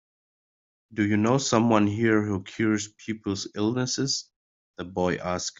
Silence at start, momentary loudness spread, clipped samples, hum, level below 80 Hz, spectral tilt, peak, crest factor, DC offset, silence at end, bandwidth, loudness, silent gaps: 0.9 s; 11 LU; under 0.1%; none; -64 dBFS; -5 dB/octave; -6 dBFS; 20 dB; under 0.1%; 0.1 s; 7.8 kHz; -25 LUFS; 4.36-4.74 s